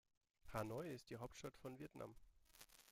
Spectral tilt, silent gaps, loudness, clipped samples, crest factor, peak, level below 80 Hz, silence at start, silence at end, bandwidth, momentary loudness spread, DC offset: -5.5 dB/octave; none; -53 LUFS; under 0.1%; 22 dB; -32 dBFS; -72 dBFS; 0.45 s; 0 s; 16.5 kHz; 15 LU; under 0.1%